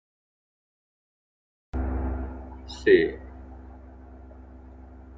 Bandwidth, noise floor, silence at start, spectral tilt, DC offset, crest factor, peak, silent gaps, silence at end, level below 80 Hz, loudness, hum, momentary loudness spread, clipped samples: 7.6 kHz; -46 dBFS; 1.75 s; -7 dB/octave; under 0.1%; 24 dB; -6 dBFS; none; 0 s; -38 dBFS; -26 LUFS; none; 27 LU; under 0.1%